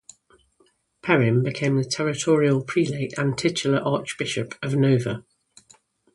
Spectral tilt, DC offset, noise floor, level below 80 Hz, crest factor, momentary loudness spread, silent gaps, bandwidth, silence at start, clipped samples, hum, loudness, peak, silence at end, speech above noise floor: -5.5 dB/octave; under 0.1%; -64 dBFS; -62 dBFS; 20 dB; 8 LU; none; 11.5 kHz; 1.05 s; under 0.1%; none; -23 LUFS; -4 dBFS; 0.95 s; 42 dB